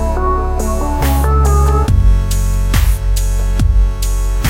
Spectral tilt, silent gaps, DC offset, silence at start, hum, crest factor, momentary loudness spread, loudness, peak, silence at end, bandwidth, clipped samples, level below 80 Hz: -6 dB/octave; none; under 0.1%; 0 s; none; 10 dB; 5 LU; -15 LUFS; -2 dBFS; 0 s; 16.5 kHz; under 0.1%; -12 dBFS